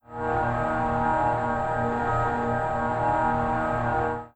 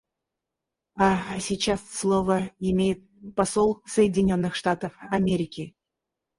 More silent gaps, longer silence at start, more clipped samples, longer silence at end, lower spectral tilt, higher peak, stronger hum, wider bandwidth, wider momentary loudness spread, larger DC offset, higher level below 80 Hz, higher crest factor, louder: neither; second, 0.1 s vs 0.95 s; neither; second, 0.1 s vs 0.7 s; first, -8 dB/octave vs -5.5 dB/octave; second, -12 dBFS vs -6 dBFS; neither; second, 8.6 kHz vs 11.5 kHz; second, 3 LU vs 10 LU; neither; first, -42 dBFS vs -50 dBFS; second, 12 dB vs 18 dB; about the same, -25 LUFS vs -25 LUFS